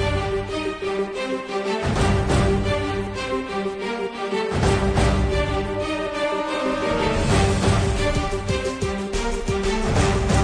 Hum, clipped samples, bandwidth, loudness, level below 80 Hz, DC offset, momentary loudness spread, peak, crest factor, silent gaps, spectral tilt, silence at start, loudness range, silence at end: none; under 0.1%; 10.5 kHz; -23 LUFS; -30 dBFS; under 0.1%; 6 LU; -6 dBFS; 14 dB; none; -5.5 dB/octave; 0 s; 2 LU; 0 s